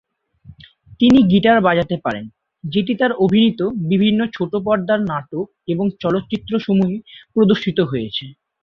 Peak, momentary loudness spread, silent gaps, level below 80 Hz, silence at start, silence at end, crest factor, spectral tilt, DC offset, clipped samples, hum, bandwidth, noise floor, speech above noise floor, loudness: -2 dBFS; 13 LU; none; -50 dBFS; 0.5 s; 0.3 s; 16 dB; -8 dB/octave; under 0.1%; under 0.1%; none; 6.8 kHz; -45 dBFS; 29 dB; -17 LUFS